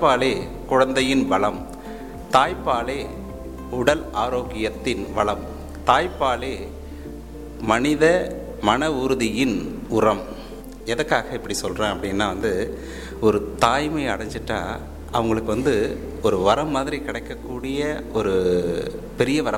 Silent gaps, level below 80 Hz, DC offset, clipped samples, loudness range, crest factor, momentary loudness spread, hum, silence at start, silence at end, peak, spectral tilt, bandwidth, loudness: none; -38 dBFS; 0.3%; under 0.1%; 3 LU; 20 dB; 15 LU; none; 0 s; 0 s; -4 dBFS; -5 dB/octave; 17 kHz; -22 LUFS